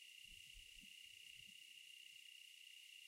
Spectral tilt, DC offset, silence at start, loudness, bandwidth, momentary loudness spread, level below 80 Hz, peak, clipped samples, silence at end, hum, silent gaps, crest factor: 1 dB/octave; under 0.1%; 0 s; -58 LUFS; 16 kHz; 1 LU; -78 dBFS; -46 dBFS; under 0.1%; 0 s; none; none; 16 dB